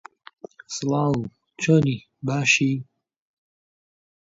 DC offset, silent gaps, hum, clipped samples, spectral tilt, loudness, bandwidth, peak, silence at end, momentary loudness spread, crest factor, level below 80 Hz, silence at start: under 0.1%; none; none; under 0.1%; -5 dB/octave; -22 LUFS; 8 kHz; -6 dBFS; 1.4 s; 12 LU; 20 dB; -60 dBFS; 0.7 s